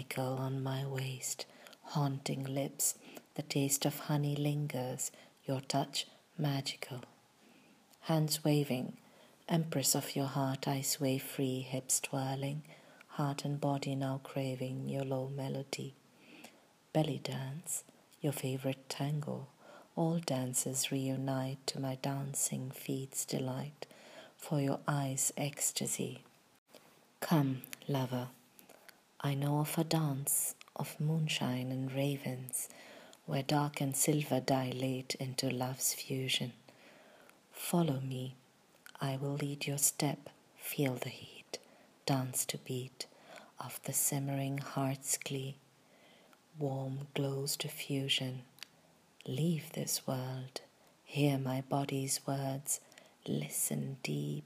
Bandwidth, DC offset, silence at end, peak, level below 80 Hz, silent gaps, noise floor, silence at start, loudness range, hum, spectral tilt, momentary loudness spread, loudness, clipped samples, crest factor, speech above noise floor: 15.5 kHz; under 0.1%; 0 s; -16 dBFS; -82 dBFS; 26.58-26.66 s; -66 dBFS; 0 s; 4 LU; none; -4.5 dB/octave; 14 LU; -36 LUFS; under 0.1%; 22 dB; 30 dB